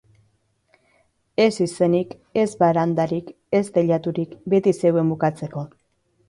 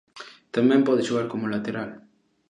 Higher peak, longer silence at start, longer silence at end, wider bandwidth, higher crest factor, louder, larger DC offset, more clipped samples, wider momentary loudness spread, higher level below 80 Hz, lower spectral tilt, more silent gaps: about the same, -6 dBFS vs -8 dBFS; first, 1.4 s vs 0.15 s; about the same, 0.6 s vs 0.5 s; first, 11.5 kHz vs 10 kHz; about the same, 16 dB vs 18 dB; first, -21 LUFS vs -24 LUFS; neither; neither; second, 11 LU vs 19 LU; first, -62 dBFS vs -68 dBFS; about the same, -7 dB/octave vs -6.5 dB/octave; neither